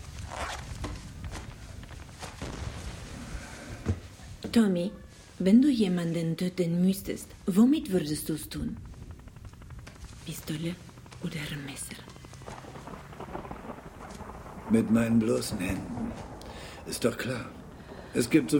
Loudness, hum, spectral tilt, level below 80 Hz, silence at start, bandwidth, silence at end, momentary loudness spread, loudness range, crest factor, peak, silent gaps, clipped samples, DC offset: -30 LUFS; none; -6 dB/octave; -48 dBFS; 0 s; 17 kHz; 0 s; 21 LU; 13 LU; 20 dB; -10 dBFS; none; under 0.1%; under 0.1%